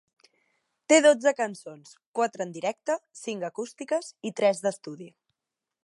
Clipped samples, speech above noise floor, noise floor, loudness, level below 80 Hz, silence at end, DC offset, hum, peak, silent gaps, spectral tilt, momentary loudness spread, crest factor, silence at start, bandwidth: under 0.1%; 61 dB; -88 dBFS; -26 LUFS; -86 dBFS; 0.75 s; under 0.1%; none; -6 dBFS; 2.06-2.14 s; -3 dB/octave; 20 LU; 22 dB; 0.9 s; 11.5 kHz